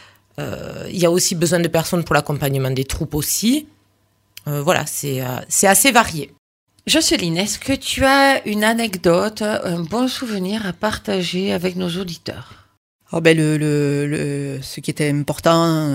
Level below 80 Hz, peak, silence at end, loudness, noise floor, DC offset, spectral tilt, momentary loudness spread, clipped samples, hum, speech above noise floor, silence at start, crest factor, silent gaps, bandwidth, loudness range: -44 dBFS; 0 dBFS; 0 s; -18 LUFS; -61 dBFS; under 0.1%; -4 dB/octave; 14 LU; under 0.1%; none; 43 dB; 0.4 s; 18 dB; 6.38-6.67 s, 12.77-12.99 s; 16.5 kHz; 5 LU